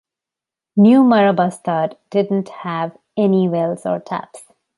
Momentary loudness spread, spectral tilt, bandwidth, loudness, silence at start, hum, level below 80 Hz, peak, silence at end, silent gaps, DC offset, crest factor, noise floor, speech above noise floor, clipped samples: 14 LU; -7.5 dB/octave; 11.5 kHz; -17 LUFS; 0.75 s; none; -66 dBFS; -2 dBFS; 0.4 s; none; under 0.1%; 16 dB; -87 dBFS; 71 dB; under 0.1%